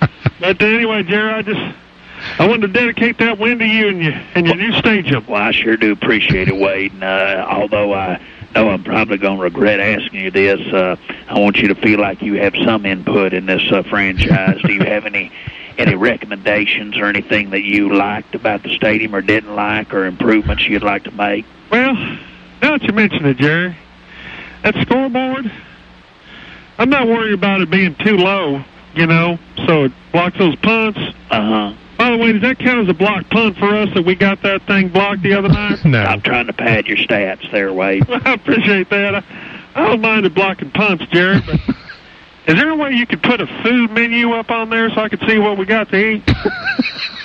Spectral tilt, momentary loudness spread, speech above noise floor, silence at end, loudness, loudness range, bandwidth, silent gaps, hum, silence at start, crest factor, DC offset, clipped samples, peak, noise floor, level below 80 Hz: -7.5 dB/octave; 7 LU; 28 dB; 0 s; -14 LUFS; 2 LU; 7.2 kHz; none; none; 0 s; 14 dB; under 0.1%; under 0.1%; -2 dBFS; -42 dBFS; -38 dBFS